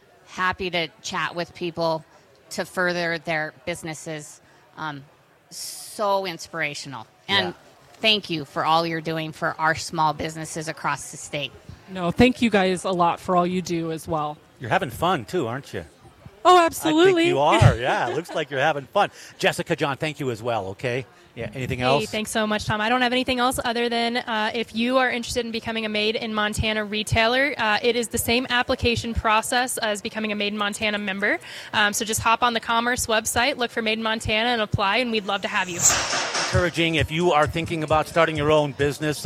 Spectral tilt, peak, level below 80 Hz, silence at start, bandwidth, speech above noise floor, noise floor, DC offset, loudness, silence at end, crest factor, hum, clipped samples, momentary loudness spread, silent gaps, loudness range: -3.5 dB/octave; -2 dBFS; -46 dBFS; 0.3 s; 16.5 kHz; 25 dB; -47 dBFS; under 0.1%; -22 LUFS; 0 s; 22 dB; none; under 0.1%; 12 LU; none; 7 LU